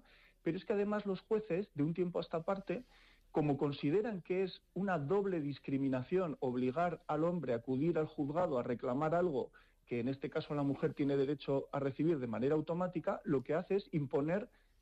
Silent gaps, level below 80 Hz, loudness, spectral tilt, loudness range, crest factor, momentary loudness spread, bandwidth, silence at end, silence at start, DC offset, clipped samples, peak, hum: none; -68 dBFS; -37 LUFS; -9 dB/octave; 2 LU; 12 dB; 5 LU; 8.2 kHz; 0.35 s; 0.45 s; under 0.1%; under 0.1%; -26 dBFS; none